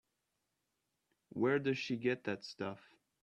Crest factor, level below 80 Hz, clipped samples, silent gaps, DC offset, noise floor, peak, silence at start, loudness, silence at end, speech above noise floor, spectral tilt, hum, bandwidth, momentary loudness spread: 18 dB; -80 dBFS; under 0.1%; none; under 0.1%; -86 dBFS; -22 dBFS; 1.35 s; -37 LUFS; 0.5 s; 49 dB; -6 dB/octave; none; 9 kHz; 12 LU